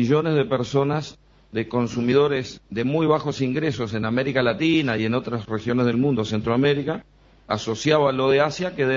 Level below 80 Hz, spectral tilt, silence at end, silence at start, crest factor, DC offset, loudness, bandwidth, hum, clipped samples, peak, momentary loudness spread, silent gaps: -54 dBFS; -6.5 dB/octave; 0 s; 0 s; 16 dB; under 0.1%; -22 LUFS; 7.6 kHz; none; under 0.1%; -6 dBFS; 9 LU; none